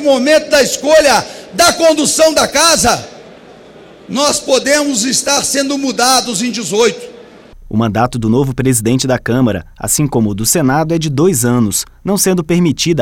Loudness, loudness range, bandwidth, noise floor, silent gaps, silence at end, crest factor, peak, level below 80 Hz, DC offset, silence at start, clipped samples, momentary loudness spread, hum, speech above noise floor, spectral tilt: -12 LUFS; 4 LU; 18 kHz; -37 dBFS; none; 0 s; 12 dB; -2 dBFS; -38 dBFS; under 0.1%; 0 s; under 0.1%; 7 LU; none; 25 dB; -3.5 dB/octave